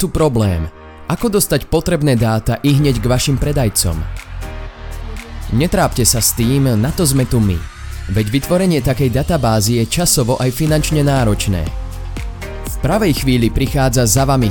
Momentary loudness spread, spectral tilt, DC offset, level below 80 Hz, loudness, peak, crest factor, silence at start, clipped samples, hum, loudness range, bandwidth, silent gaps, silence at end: 15 LU; -5 dB/octave; under 0.1%; -26 dBFS; -15 LUFS; 0 dBFS; 14 dB; 0 s; under 0.1%; none; 2 LU; 19 kHz; none; 0 s